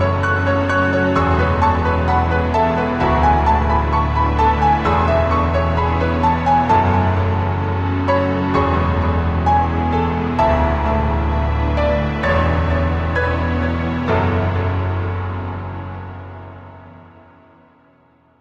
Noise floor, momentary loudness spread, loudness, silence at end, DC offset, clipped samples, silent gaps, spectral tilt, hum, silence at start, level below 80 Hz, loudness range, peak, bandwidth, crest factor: -54 dBFS; 6 LU; -17 LUFS; 1.4 s; under 0.1%; under 0.1%; none; -8 dB/octave; none; 0 s; -26 dBFS; 6 LU; -2 dBFS; 7 kHz; 14 dB